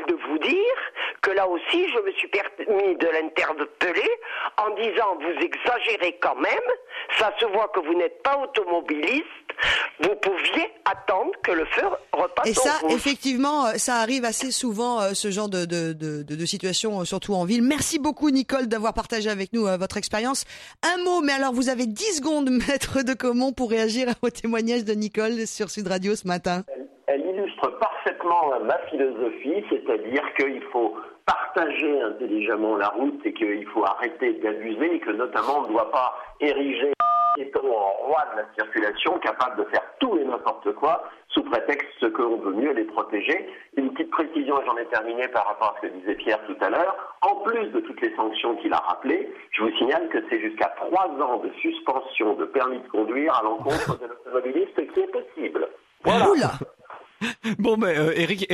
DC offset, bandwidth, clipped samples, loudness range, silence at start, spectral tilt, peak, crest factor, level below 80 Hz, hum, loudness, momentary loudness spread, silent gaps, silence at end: under 0.1%; 14 kHz; under 0.1%; 2 LU; 0 s; -3.5 dB/octave; -8 dBFS; 16 dB; -56 dBFS; none; -24 LUFS; 6 LU; none; 0 s